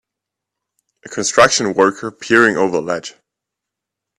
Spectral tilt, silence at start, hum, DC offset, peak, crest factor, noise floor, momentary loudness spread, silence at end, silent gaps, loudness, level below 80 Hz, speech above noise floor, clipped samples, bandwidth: -3 dB/octave; 1.05 s; none; under 0.1%; 0 dBFS; 18 dB; -82 dBFS; 15 LU; 1.1 s; none; -14 LUFS; -56 dBFS; 67 dB; under 0.1%; 13 kHz